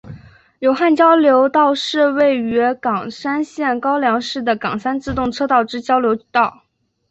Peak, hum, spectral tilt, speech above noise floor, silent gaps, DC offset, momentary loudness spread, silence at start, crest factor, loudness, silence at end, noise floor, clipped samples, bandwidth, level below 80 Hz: -2 dBFS; none; -5 dB/octave; 23 dB; none; under 0.1%; 9 LU; 0.05 s; 14 dB; -16 LUFS; 0.6 s; -39 dBFS; under 0.1%; 8.2 kHz; -48 dBFS